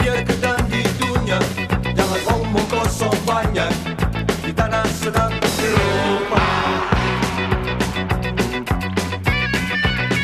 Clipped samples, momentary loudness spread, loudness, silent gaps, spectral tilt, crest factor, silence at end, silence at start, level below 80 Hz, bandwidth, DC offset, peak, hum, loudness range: under 0.1%; 4 LU; -19 LUFS; none; -5 dB/octave; 18 dB; 0 s; 0 s; -30 dBFS; 14 kHz; under 0.1%; -2 dBFS; none; 1 LU